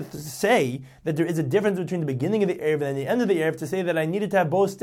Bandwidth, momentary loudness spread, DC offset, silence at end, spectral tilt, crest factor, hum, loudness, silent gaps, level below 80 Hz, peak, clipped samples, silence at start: 16.5 kHz; 6 LU; under 0.1%; 0 s; -6 dB/octave; 16 dB; none; -24 LUFS; none; -64 dBFS; -8 dBFS; under 0.1%; 0 s